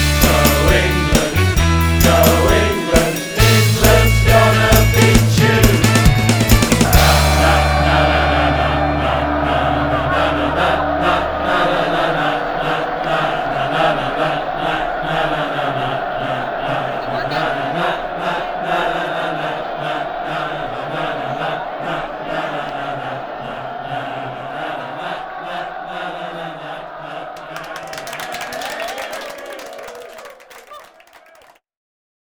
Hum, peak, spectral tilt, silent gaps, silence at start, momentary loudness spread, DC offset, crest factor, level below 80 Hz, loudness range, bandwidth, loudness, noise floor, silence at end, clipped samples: none; 0 dBFS; -4.5 dB/octave; none; 0 s; 15 LU; under 0.1%; 16 dB; -24 dBFS; 15 LU; over 20 kHz; -16 LUFS; -48 dBFS; 1.4 s; under 0.1%